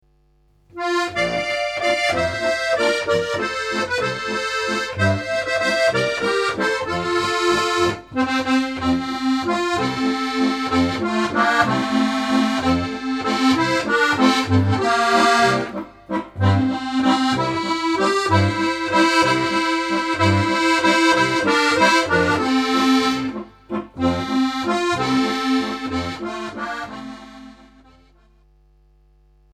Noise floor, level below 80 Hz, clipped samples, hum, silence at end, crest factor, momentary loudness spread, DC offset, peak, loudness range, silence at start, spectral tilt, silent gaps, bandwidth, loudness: -58 dBFS; -50 dBFS; under 0.1%; none; 2.05 s; 18 dB; 9 LU; under 0.1%; -2 dBFS; 5 LU; 0.75 s; -4.5 dB/octave; none; 14 kHz; -19 LUFS